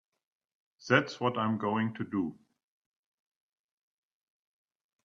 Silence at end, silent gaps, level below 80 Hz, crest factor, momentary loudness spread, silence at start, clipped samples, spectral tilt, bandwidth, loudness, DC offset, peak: 2.7 s; none; -76 dBFS; 26 dB; 9 LU; 0.8 s; under 0.1%; -6 dB/octave; 7.6 kHz; -31 LUFS; under 0.1%; -8 dBFS